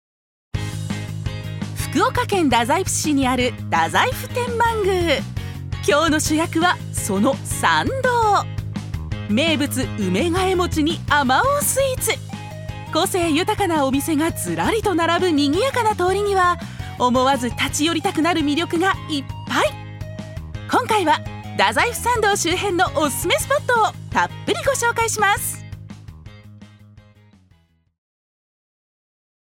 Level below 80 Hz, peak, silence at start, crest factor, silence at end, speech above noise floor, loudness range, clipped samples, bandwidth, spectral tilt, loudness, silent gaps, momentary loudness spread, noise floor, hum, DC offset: -40 dBFS; 0 dBFS; 0.55 s; 20 dB; 2.45 s; 39 dB; 3 LU; under 0.1%; 17.5 kHz; -4 dB/octave; -19 LUFS; none; 11 LU; -58 dBFS; none; under 0.1%